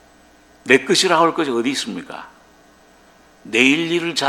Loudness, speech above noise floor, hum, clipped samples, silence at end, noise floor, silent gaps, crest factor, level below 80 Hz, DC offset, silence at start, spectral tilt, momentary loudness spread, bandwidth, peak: -16 LUFS; 33 dB; none; under 0.1%; 0 s; -50 dBFS; none; 20 dB; -60 dBFS; under 0.1%; 0.65 s; -3 dB/octave; 19 LU; 16.5 kHz; 0 dBFS